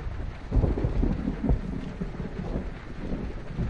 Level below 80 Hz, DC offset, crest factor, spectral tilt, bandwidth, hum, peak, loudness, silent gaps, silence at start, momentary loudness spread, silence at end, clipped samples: -32 dBFS; under 0.1%; 18 dB; -9 dB/octave; 7 kHz; none; -10 dBFS; -31 LUFS; none; 0 s; 9 LU; 0 s; under 0.1%